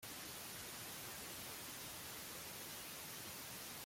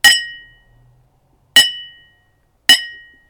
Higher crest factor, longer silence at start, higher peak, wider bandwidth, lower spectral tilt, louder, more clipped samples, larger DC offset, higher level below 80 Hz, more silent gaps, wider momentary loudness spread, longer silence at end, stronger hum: about the same, 14 dB vs 18 dB; about the same, 0 s vs 0.05 s; second, -36 dBFS vs 0 dBFS; second, 16.5 kHz vs over 20 kHz; first, -1.5 dB/octave vs 2 dB/octave; second, -48 LUFS vs -12 LUFS; neither; neither; second, -74 dBFS vs -54 dBFS; neither; second, 0 LU vs 20 LU; second, 0 s vs 0.4 s; neither